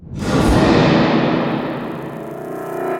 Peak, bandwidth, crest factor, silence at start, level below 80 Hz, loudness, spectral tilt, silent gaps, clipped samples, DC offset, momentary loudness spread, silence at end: -2 dBFS; 17 kHz; 16 dB; 0 s; -30 dBFS; -16 LUFS; -6.5 dB/octave; none; under 0.1%; under 0.1%; 15 LU; 0 s